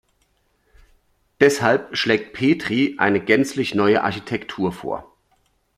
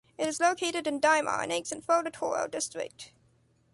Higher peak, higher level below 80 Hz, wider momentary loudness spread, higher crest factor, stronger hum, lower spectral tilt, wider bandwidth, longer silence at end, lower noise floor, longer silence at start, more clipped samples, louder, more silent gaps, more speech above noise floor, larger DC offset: first, 0 dBFS vs -12 dBFS; first, -56 dBFS vs -72 dBFS; second, 11 LU vs 14 LU; about the same, 22 dB vs 20 dB; neither; first, -5 dB/octave vs -2 dB/octave; first, 14 kHz vs 11.5 kHz; about the same, 0.75 s vs 0.65 s; about the same, -65 dBFS vs -67 dBFS; first, 1.4 s vs 0.2 s; neither; first, -20 LUFS vs -29 LUFS; neither; first, 46 dB vs 37 dB; neither